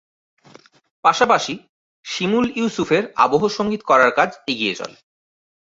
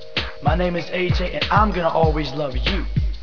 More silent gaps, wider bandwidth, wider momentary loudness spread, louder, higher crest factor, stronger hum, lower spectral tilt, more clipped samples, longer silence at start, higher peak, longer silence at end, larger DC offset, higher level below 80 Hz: first, 1.69-2.03 s vs none; first, 7.8 kHz vs 5.4 kHz; first, 14 LU vs 6 LU; first, -18 LUFS vs -21 LUFS; about the same, 20 dB vs 16 dB; neither; second, -4 dB/octave vs -7 dB/octave; neither; first, 1.05 s vs 0 s; first, 0 dBFS vs -4 dBFS; first, 0.85 s vs 0 s; second, under 0.1% vs 2%; second, -60 dBFS vs -26 dBFS